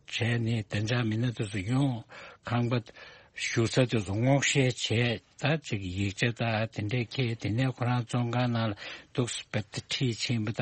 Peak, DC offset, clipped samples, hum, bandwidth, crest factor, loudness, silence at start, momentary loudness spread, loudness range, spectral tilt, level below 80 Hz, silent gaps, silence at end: -10 dBFS; under 0.1%; under 0.1%; none; 8.8 kHz; 18 dB; -30 LUFS; 0.1 s; 8 LU; 3 LU; -5 dB/octave; -60 dBFS; none; 0 s